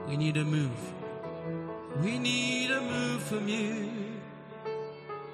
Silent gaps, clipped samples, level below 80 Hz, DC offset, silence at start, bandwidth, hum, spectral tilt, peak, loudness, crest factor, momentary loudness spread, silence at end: none; under 0.1%; -70 dBFS; under 0.1%; 0 s; 13 kHz; none; -5 dB/octave; -16 dBFS; -32 LUFS; 18 dB; 12 LU; 0 s